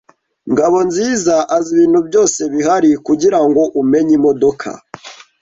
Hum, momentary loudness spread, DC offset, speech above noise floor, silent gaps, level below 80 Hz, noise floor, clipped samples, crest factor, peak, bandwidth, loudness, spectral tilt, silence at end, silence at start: none; 15 LU; under 0.1%; 23 dB; none; -54 dBFS; -35 dBFS; under 0.1%; 10 dB; -2 dBFS; 8 kHz; -13 LUFS; -4.5 dB/octave; 0.3 s; 0.45 s